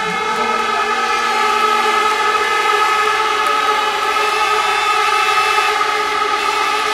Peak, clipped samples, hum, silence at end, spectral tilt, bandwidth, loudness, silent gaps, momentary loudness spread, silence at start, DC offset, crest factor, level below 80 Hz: -2 dBFS; under 0.1%; none; 0 s; -0.5 dB/octave; 16.5 kHz; -14 LUFS; none; 3 LU; 0 s; under 0.1%; 14 dB; -52 dBFS